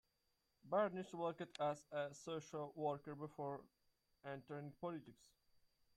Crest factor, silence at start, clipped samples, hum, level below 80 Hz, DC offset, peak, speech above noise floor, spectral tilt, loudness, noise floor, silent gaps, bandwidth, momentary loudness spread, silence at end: 20 dB; 0.65 s; under 0.1%; none; -84 dBFS; under 0.1%; -28 dBFS; 39 dB; -6 dB/octave; -47 LUFS; -85 dBFS; none; 14 kHz; 12 LU; 0.8 s